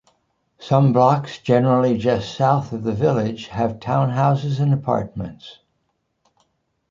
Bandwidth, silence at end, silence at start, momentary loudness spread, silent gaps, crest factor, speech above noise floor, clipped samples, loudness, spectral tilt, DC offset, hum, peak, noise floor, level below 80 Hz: 7.4 kHz; 1.4 s; 0.6 s; 9 LU; none; 18 dB; 52 dB; under 0.1%; -19 LUFS; -8 dB/octave; under 0.1%; none; -2 dBFS; -71 dBFS; -52 dBFS